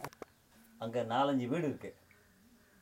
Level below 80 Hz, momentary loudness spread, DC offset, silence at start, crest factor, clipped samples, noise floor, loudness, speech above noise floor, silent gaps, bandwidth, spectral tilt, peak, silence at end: -76 dBFS; 20 LU; under 0.1%; 0 s; 18 dB; under 0.1%; -65 dBFS; -35 LUFS; 30 dB; none; 16 kHz; -6.5 dB/octave; -20 dBFS; 0.9 s